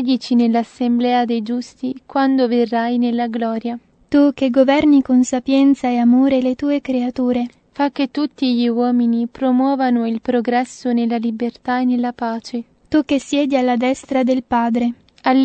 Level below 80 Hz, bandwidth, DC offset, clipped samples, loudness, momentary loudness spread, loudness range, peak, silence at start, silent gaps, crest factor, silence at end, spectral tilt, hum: -56 dBFS; 8.6 kHz; under 0.1%; under 0.1%; -17 LUFS; 9 LU; 4 LU; -2 dBFS; 0 s; none; 16 dB; 0 s; -5 dB/octave; none